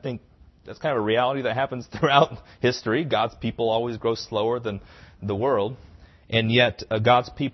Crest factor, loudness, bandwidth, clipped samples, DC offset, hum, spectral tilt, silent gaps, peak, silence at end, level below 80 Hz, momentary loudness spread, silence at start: 22 dB; -23 LUFS; 6.2 kHz; under 0.1%; under 0.1%; none; -6 dB/octave; none; -2 dBFS; 0.05 s; -52 dBFS; 12 LU; 0.05 s